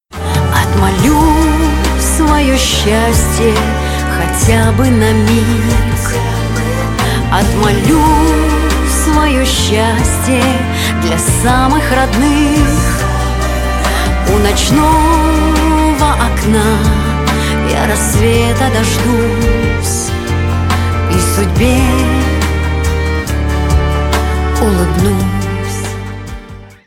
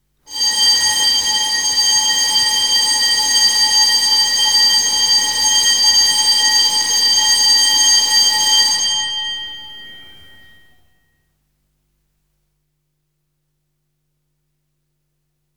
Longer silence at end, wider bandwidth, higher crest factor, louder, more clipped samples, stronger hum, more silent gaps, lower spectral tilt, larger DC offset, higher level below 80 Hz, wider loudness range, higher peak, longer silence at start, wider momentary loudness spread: second, 0.15 s vs 5.55 s; second, 17 kHz vs over 20 kHz; about the same, 10 dB vs 14 dB; about the same, -12 LUFS vs -11 LUFS; neither; second, none vs 50 Hz at -65 dBFS; neither; first, -5 dB/octave vs 3 dB/octave; neither; first, -16 dBFS vs -58 dBFS; second, 2 LU vs 7 LU; about the same, 0 dBFS vs -2 dBFS; second, 0.1 s vs 0.3 s; about the same, 5 LU vs 7 LU